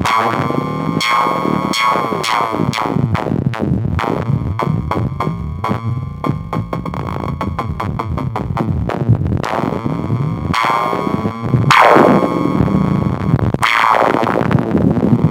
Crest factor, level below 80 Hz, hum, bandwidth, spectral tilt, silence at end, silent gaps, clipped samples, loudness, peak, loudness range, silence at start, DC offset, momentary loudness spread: 16 dB; -34 dBFS; none; 16.5 kHz; -6.5 dB/octave; 0 s; none; under 0.1%; -16 LUFS; 0 dBFS; 8 LU; 0 s; under 0.1%; 10 LU